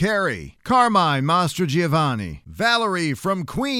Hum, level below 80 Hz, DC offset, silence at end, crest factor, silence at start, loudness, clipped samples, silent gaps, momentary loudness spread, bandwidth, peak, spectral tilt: none; -48 dBFS; under 0.1%; 0 s; 16 dB; 0 s; -20 LUFS; under 0.1%; none; 8 LU; 16.5 kHz; -4 dBFS; -5 dB/octave